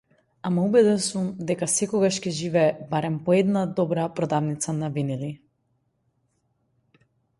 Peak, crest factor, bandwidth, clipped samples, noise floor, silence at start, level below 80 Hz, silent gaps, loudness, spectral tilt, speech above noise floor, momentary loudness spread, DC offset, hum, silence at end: -6 dBFS; 18 dB; 11.5 kHz; under 0.1%; -71 dBFS; 0.45 s; -64 dBFS; none; -24 LUFS; -5.5 dB/octave; 48 dB; 9 LU; under 0.1%; none; 2.05 s